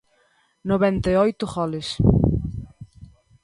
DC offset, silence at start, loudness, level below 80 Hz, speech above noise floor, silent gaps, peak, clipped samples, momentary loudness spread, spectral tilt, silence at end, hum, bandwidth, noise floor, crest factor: under 0.1%; 0.65 s; -21 LUFS; -34 dBFS; 43 dB; none; -2 dBFS; under 0.1%; 16 LU; -7.5 dB/octave; 0.4 s; none; 11.5 kHz; -63 dBFS; 20 dB